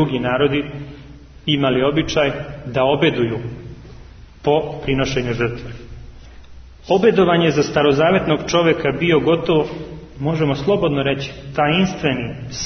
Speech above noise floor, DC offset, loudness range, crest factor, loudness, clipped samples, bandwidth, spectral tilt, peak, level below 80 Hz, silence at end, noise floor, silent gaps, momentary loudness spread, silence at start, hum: 22 dB; under 0.1%; 6 LU; 16 dB; -18 LUFS; under 0.1%; 6.6 kHz; -6 dB/octave; -2 dBFS; -40 dBFS; 0 s; -40 dBFS; none; 14 LU; 0 s; none